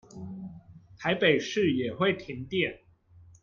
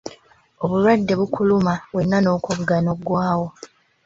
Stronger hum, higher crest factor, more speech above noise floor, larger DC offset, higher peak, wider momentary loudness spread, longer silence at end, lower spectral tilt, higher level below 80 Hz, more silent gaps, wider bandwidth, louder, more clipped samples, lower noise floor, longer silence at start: neither; about the same, 20 dB vs 18 dB; about the same, 28 dB vs 31 dB; neither; second, -10 dBFS vs -2 dBFS; first, 18 LU vs 7 LU; second, 0.2 s vs 0.4 s; second, -5.5 dB/octave vs -7 dB/octave; second, -64 dBFS vs -52 dBFS; neither; about the same, 7.4 kHz vs 7.8 kHz; second, -28 LUFS vs -20 LUFS; neither; first, -56 dBFS vs -50 dBFS; about the same, 0.15 s vs 0.05 s